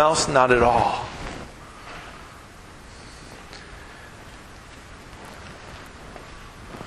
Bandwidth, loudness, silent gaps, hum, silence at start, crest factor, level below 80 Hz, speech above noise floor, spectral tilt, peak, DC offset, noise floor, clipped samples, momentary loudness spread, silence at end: 13 kHz; -20 LUFS; none; none; 0 s; 24 dB; -44 dBFS; 25 dB; -4 dB/octave; -4 dBFS; under 0.1%; -44 dBFS; under 0.1%; 25 LU; 0 s